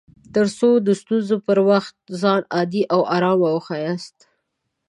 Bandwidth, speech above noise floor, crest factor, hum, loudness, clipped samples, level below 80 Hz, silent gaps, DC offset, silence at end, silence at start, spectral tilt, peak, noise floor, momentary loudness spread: 11.5 kHz; 57 dB; 16 dB; none; -19 LUFS; under 0.1%; -64 dBFS; none; under 0.1%; 0.8 s; 0.35 s; -6.5 dB/octave; -2 dBFS; -76 dBFS; 9 LU